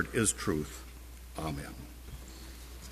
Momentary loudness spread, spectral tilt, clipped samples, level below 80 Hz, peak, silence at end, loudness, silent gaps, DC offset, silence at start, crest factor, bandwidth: 18 LU; -4 dB/octave; under 0.1%; -48 dBFS; -12 dBFS; 0 s; -35 LUFS; none; under 0.1%; 0 s; 24 dB; 15.5 kHz